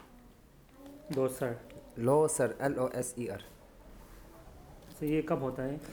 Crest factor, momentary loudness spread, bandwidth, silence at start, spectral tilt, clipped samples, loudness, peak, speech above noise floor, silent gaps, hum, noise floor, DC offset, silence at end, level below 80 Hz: 20 dB; 26 LU; over 20 kHz; 0 s; -5.5 dB/octave; under 0.1%; -33 LUFS; -14 dBFS; 26 dB; none; none; -58 dBFS; under 0.1%; 0 s; -58 dBFS